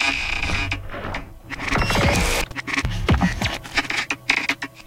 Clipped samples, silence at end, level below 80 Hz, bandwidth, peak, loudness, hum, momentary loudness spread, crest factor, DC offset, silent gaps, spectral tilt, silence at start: under 0.1%; 0.05 s; -30 dBFS; 16.5 kHz; -2 dBFS; -22 LUFS; none; 11 LU; 20 dB; under 0.1%; none; -4 dB/octave; 0 s